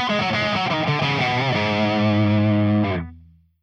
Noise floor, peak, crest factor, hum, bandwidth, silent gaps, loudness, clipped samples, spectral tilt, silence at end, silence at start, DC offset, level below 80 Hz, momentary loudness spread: -48 dBFS; -8 dBFS; 12 dB; none; 7.2 kHz; none; -20 LUFS; under 0.1%; -6.5 dB/octave; 0.45 s; 0 s; under 0.1%; -54 dBFS; 3 LU